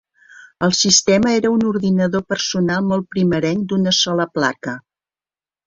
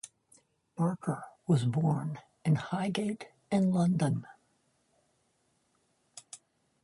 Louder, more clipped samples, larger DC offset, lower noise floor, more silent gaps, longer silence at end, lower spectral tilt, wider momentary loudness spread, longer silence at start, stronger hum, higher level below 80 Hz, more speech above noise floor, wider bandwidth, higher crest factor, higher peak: first, -17 LUFS vs -31 LUFS; neither; neither; first, under -90 dBFS vs -74 dBFS; neither; first, 0.9 s vs 0.45 s; second, -4 dB/octave vs -7 dB/octave; second, 8 LU vs 22 LU; first, 0.4 s vs 0.05 s; neither; first, -52 dBFS vs -70 dBFS; first, over 73 dB vs 45 dB; second, 7.6 kHz vs 11.5 kHz; about the same, 18 dB vs 18 dB; first, 0 dBFS vs -16 dBFS